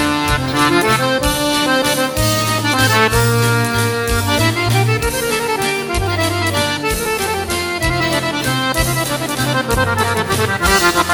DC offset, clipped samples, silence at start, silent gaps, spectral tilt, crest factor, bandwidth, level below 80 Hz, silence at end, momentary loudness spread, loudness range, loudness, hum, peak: under 0.1%; under 0.1%; 0 s; none; -4 dB/octave; 16 dB; 18 kHz; -30 dBFS; 0 s; 5 LU; 3 LU; -15 LUFS; none; 0 dBFS